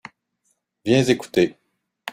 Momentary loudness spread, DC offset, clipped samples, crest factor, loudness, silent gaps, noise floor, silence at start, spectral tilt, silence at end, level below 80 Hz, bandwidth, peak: 14 LU; under 0.1%; under 0.1%; 20 dB; -20 LUFS; none; -71 dBFS; 0.85 s; -5.5 dB/octave; 0 s; -58 dBFS; 15.5 kHz; -4 dBFS